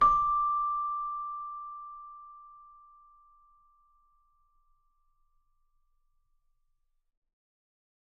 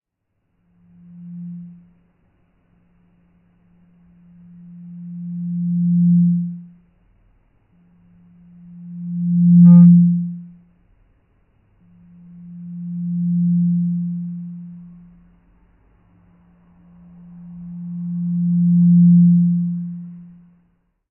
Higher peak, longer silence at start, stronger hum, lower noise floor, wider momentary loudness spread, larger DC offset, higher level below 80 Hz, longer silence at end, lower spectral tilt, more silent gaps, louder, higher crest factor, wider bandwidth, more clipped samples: second, -14 dBFS vs -2 dBFS; second, 0 s vs 1.15 s; neither; about the same, -75 dBFS vs -73 dBFS; about the same, 24 LU vs 26 LU; neither; about the same, -58 dBFS vs -62 dBFS; first, 5.35 s vs 0.9 s; second, -5 dB/octave vs -16.5 dB/octave; neither; second, -30 LUFS vs -15 LUFS; first, 22 dB vs 16 dB; first, 6.6 kHz vs 1.3 kHz; neither